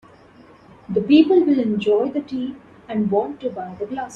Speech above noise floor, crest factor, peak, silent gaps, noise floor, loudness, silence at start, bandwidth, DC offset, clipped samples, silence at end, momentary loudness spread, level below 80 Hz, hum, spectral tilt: 29 dB; 18 dB; -2 dBFS; none; -48 dBFS; -20 LUFS; 0.9 s; 7.2 kHz; under 0.1%; under 0.1%; 0 s; 14 LU; -60 dBFS; none; -7.5 dB/octave